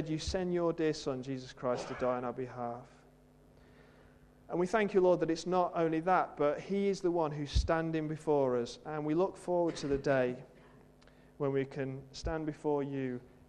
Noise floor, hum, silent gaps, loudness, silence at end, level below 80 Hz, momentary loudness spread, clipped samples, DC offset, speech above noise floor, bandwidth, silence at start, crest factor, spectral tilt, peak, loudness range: -61 dBFS; none; none; -34 LUFS; 0.2 s; -50 dBFS; 10 LU; under 0.1%; under 0.1%; 28 dB; 10.5 kHz; 0 s; 18 dB; -6.5 dB/octave; -16 dBFS; 7 LU